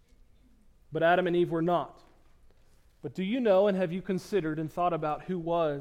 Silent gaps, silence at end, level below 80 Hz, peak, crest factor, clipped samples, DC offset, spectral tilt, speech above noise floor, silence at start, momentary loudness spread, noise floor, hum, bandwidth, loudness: none; 0 s; -58 dBFS; -14 dBFS; 16 dB; under 0.1%; under 0.1%; -7.5 dB/octave; 32 dB; 0.9 s; 11 LU; -60 dBFS; none; 15.5 kHz; -29 LUFS